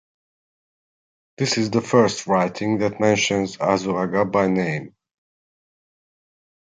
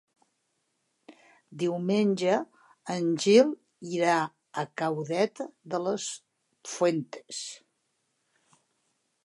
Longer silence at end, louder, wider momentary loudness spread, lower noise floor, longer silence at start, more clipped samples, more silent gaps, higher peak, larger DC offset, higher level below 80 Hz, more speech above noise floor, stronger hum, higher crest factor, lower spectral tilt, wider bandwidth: first, 1.8 s vs 1.65 s; first, -21 LUFS vs -28 LUFS; second, 5 LU vs 19 LU; first, under -90 dBFS vs -77 dBFS; first, 1.4 s vs 1.1 s; neither; neither; first, -4 dBFS vs -8 dBFS; neither; first, -58 dBFS vs -84 dBFS; first, over 70 dB vs 50 dB; neither; about the same, 18 dB vs 22 dB; about the same, -5 dB/octave vs -5 dB/octave; second, 9.6 kHz vs 11.5 kHz